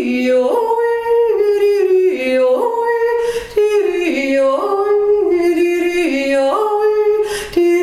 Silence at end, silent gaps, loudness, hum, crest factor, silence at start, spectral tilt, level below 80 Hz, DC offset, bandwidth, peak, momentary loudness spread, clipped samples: 0 s; none; -15 LUFS; none; 10 dB; 0 s; -4 dB/octave; -48 dBFS; under 0.1%; 14.5 kHz; -4 dBFS; 3 LU; under 0.1%